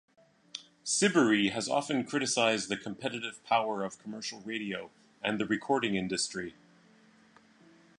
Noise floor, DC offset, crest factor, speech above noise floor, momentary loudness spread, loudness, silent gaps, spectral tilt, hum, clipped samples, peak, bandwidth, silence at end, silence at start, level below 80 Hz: -61 dBFS; under 0.1%; 20 dB; 30 dB; 14 LU; -31 LUFS; none; -3 dB/octave; none; under 0.1%; -12 dBFS; 11 kHz; 1.45 s; 0.55 s; -72 dBFS